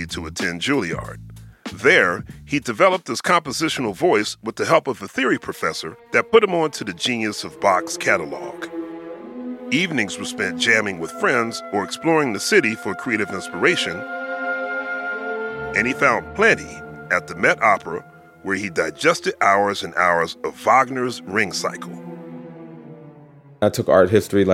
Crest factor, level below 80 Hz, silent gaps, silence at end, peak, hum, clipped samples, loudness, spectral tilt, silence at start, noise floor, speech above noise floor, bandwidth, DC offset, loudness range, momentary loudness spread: 20 dB; -54 dBFS; none; 0 s; 0 dBFS; none; under 0.1%; -20 LUFS; -4 dB/octave; 0 s; -46 dBFS; 26 dB; 16.5 kHz; under 0.1%; 3 LU; 16 LU